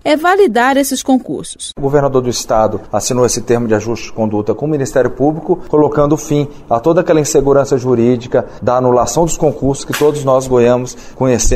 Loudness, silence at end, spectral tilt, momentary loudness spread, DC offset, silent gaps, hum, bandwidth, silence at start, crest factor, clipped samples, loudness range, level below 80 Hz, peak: -13 LUFS; 0 s; -5 dB/octave; 7 LU; under 0.1%; none; none; 16 kHz; 0.05 s; 12 dB; under 0.1%; 2 LU; -30 dBFS; 0 dBFS